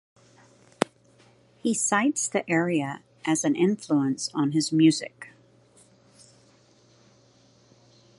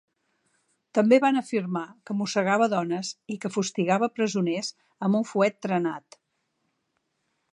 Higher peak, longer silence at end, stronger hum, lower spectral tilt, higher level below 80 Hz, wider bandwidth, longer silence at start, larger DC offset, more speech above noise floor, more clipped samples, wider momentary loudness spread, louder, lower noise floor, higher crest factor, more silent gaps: first, 0 dBFS vs -6 dBFS; first, 2.9 s vs 1.55 s; neither; about the same, -4.5 dB/octave vs -5.5 dB/octave; about the same, -76 dBFS vs -78 dBFS; about the same, 11.5 kHz vs 10.5 kHz; second, 0.8 s vs 0.95 s; neither; second, 35 dB vs 51 dB; neither; about the same, 12 LU vs 12 LU; about the same, -25 LUFS vs -26 LUFS; second, -59 dBFS vs -76 dBFS; first, 28 dB vs 20 dB; neither